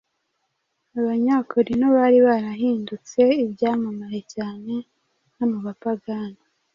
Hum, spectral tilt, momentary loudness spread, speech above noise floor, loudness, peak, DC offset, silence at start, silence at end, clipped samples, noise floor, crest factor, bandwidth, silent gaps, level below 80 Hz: none; -6.5 dB/octave; 15 LU; 53 dB; -22 LUFS; -6 dBFS; under 0.1%; 0.95 s; 0.4 s; under 0.1%; -74 dBFS; 16 dB; 7.4 kHz; none; -62 dBFS